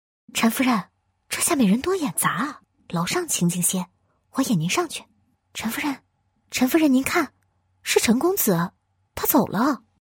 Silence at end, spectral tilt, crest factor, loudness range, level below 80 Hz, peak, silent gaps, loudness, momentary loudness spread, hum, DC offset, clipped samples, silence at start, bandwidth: 0.25 s; -4 dB/octave; 18 dB; 3 LU; -58 dBFS; -4 dBFS; none; -22 LUFS; 12 LU; none; under 0.1%; under 0.1%; 0.35 s; 18 kHz